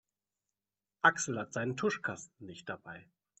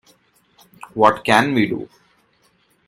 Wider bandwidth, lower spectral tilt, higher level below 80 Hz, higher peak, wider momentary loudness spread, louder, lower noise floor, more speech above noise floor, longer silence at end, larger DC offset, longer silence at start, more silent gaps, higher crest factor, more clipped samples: second, 8.4 kHz vs 15.5 kHz; second, -3.5 dB/octave vs -5 dB/octave; second, -76 dBFS vs -60 dBFS; second, -12 dBFS vs 0 dBFS; first, 20 LU vs 17 LU; second, -33 LUFS vs -17 LUFS; first, under -90 dBFS vs -60 dBFS; first, over 55 dB vs 44 dB; second, 0.35 s vs 1.05 s; neither; about the same, 1.05 s vs 0.95 s; neither; about the same, 26 dB vs 22 dB; neither